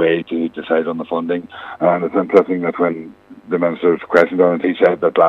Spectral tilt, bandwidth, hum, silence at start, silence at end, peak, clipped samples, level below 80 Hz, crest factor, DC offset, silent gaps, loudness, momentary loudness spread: -8 dB/octave; 7.2 kHz; none; 0 s; 0 s; 0 dBFS; under 0.1%; -62 dBFS; 16 dB; under 0.1%; none; -17 LUFS; 9 LU